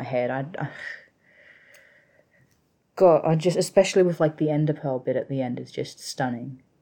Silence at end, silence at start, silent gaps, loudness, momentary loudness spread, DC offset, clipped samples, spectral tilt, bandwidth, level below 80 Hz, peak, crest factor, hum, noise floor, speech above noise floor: 0.25 s; 0 s; none; -24 LUFS; 17 LU; under 0.1%; under 0.1%; -6 dB/octave; 18.5 kHz; -68 dBFS; -6 dBFS; 20 dB; none; -67 dBFS; 43 dB